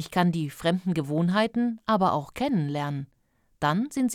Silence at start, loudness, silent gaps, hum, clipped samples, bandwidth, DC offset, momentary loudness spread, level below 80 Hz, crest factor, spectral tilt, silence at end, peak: 0 s; -26 LUFS; none; none; under 0.1%; 15 kHz; under 0.1%; 6 LU; -60 dBFS; 16 dB; -6.5 dB/octave; 0 s; -10 dBFS